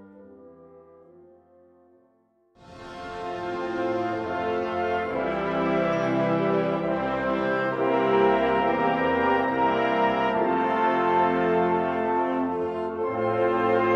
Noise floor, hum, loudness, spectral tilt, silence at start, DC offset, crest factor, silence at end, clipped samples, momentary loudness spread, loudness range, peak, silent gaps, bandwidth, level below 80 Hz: -65 dBFS; none; -24 LUFS; -7.5 dB/octave; 0 s; under 0.1%; 16 dB; 0 s; under 0.1%; 7 LU; 10 LU; -10 dBFS; none; 7.8 kHz; -56 dBFS